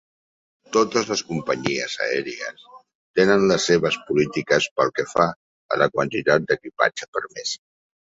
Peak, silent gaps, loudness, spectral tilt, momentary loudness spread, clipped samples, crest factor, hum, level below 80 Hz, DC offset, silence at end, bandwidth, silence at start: -2 dBFS; 2.95-3.14 s, 4.71-4.76 s, 5.36-5.69 s, 7.08-7.13 s; -22 LUFS; -4 dB/octave; 11 LU; under 0.1%; 20 dB; none; -60 dBFS; under 0.1%; 0.55 s; 8 kHz; 0.7 s